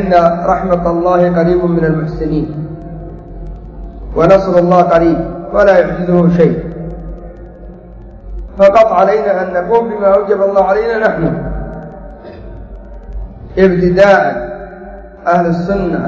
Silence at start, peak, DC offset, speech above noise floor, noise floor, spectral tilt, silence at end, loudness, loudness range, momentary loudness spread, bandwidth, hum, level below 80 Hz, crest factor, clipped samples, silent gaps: 0 s; 0 dBFS; under 0.1%; 22 dB; -32 dBFS; -8.5 dB/octave; 0 s; -11 LUFS; 5 LU; 22 LU; 7.4 kHz; none; -30 dBFS; 12 dB; 0.4%; none